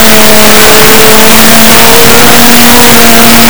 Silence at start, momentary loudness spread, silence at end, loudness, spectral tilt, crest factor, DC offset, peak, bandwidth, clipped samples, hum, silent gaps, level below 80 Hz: 0 s; 1 LU; 0 s; 1 LUFS; -2 dB/octave; 4 dB; 50%; 0 dBFS; over 20 kHz; 100%; none; none; -22 dBFS